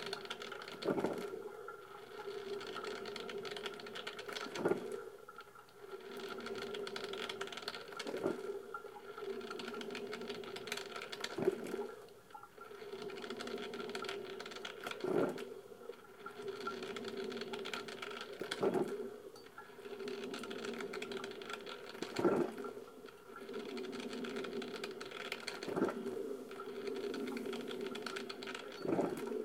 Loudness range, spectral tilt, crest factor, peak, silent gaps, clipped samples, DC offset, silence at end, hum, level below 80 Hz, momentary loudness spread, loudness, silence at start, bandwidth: 3 LU; -4.5 dB/octave; 22 dB; -20 dBFS; none; under 0.1%; under 0.1%; 0 s; none; -80 dBFS; 14 LU; -43 LUFS; 0 s; 17 kHz